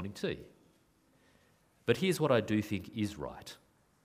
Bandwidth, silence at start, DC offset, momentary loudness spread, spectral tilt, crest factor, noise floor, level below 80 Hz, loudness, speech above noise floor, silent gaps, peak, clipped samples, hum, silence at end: 15.5 kHz; 0 s; under 0.1%; 18 LU; -5.5 dB/octave; 22 dB; -69 dBFS; -64 dBFS; -34 LUFS; 36 dB; none; -12 dBFS; under 0.1%; none; 0.5 s